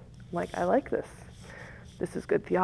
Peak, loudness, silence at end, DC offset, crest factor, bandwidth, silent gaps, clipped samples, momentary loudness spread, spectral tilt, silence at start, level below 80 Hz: -10 dBFS; -31 LUFS; 0 s; under 0.1%; 20 dB; 11 kHz; none; under 0.1%; 19 LU; -7 dB/octave; 0 s; -54 dBFS